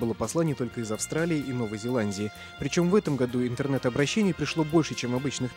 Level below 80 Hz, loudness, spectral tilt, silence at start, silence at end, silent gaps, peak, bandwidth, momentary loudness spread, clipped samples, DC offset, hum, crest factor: -56 dBFS; -27 LUFS; -5.5 dB/octave; 0 s; 0 s; none; -10 dBFS; 16 kHz; 7 LU; under 0.1%; under 0.1%; none; 18 dB